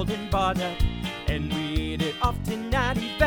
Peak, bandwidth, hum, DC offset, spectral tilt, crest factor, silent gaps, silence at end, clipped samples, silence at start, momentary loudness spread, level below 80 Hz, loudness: -8 dBFS; over 20 kHz; none; under 0.1%; -5.5 dB/octave; 18 dB; none; 0 s; under 0.1%; 0 s; 4 LU; -32 dBFS; -27 LUFS